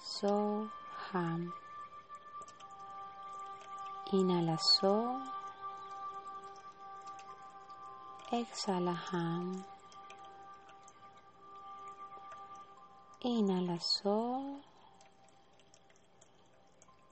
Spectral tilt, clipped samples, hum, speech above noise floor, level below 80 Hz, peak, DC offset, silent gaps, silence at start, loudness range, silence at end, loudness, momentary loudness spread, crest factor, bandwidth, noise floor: -5 dB/octave; under 0.1%; none; 32 dB; -80 dBFS; -18 dBFS; under 0.1%; none; 0 s; 12 LU; 0.2 s; -36 LUFS; 21 LU; 22 dB; 8.4 kHz; -66 dBFS